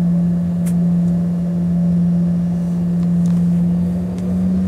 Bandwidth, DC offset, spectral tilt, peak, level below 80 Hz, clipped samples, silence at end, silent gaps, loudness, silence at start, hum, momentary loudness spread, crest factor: 2.4 kHz; under 0.1%; -10 dB/octave; -8 dBFS; -38 dBFS; under 0.1%; 0 s; none; -17 LUFS; 0 s; none; 3 LU; 8 dB